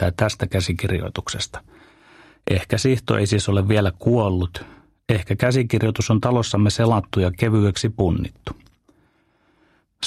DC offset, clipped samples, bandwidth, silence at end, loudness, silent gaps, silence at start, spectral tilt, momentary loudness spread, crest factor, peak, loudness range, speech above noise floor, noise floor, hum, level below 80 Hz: under 0.1%; under 0.1%; 14 kHz; 0 s; -21 LUFS; none; 0 s; -6 dB/octave; 11 LU; 20 dB; -2 dBFS; 3 LU; 42 dB; -62 dBFS; none; -42 dBFS